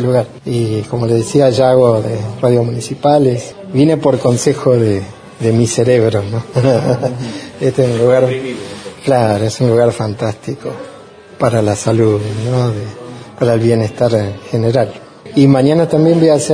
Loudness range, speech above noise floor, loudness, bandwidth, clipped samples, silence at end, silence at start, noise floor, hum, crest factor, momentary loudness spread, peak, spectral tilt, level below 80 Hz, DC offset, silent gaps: 3 LU; 24 dB; -13 LUFS; 10.5 kHz; under 0.1%; 0 s; 0 s; -36 dBFS; none; 12 dB; 13 LU; 0 dBFS; -6.5 dB/octave; -46 dBFS; under 0.1%; none